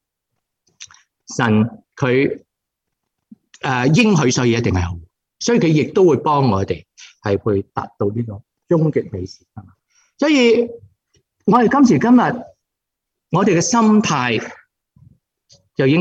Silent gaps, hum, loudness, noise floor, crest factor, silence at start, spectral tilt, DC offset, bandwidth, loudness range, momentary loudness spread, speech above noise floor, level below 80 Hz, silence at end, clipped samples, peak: none; none; -16 LUFS; -81 dBFS; 16 dB; 0.8 s; -5.5 dB/octave; under 0.1%; 8.4 kHz; 6 LU; 15 LU; 65 dB; -50 dBFS; 0 s; under 0.1%; -2 dBFS